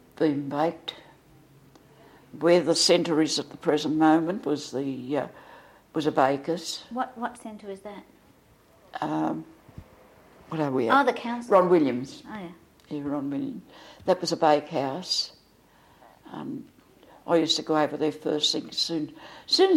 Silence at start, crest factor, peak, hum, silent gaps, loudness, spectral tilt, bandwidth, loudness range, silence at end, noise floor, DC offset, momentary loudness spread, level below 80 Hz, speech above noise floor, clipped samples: 0.2 s; 20 dB; -6 dBFS; none; none; -25 LUFS; -4 dB/octave; 15.5 kHz; 8 LU; 0 s; -58 dBFS; under 0.1%; 18 LU; -66 dBFS; 33 dB; under 0.1%